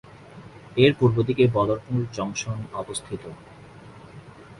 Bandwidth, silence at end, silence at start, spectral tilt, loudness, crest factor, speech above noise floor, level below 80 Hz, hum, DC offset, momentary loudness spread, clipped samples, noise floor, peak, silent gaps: 11.5 kHz; 0.05 s; 0.35 s; -6 dB/octave; -23 LUFS; 20 dB; 22 dB; -52 dBFS; none; under 0.1%; 25 LU; under 0.1%; -45 dBFS; -4 dBFS; none